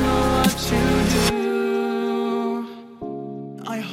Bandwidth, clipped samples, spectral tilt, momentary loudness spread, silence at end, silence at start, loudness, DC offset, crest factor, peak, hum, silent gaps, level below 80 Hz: 16 kHz; under 0.1%; -5 dB/octave; 15 LU; 0 s; 0 s; -21 LUFS; under 0.1%; 18 dB; -4 dBFS; none; none; -34 dBFS